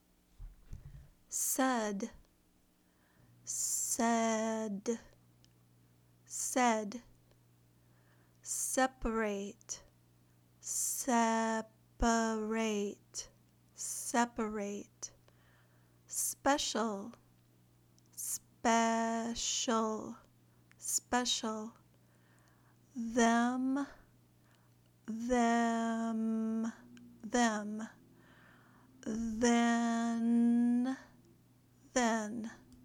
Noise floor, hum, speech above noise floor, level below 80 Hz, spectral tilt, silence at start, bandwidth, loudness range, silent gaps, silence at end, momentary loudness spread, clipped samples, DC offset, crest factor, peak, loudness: -70 dBFS; 60 Hz at -70 dBFS; 37 dB; -58 dBFS; -3 dB/octave; 0.4 s; over 20 kHz; 5 LU; none; 0.1 s; 17 LU; under 0.1%; under 0.1%; 20 dB; -18 dBFS; -34 LUFS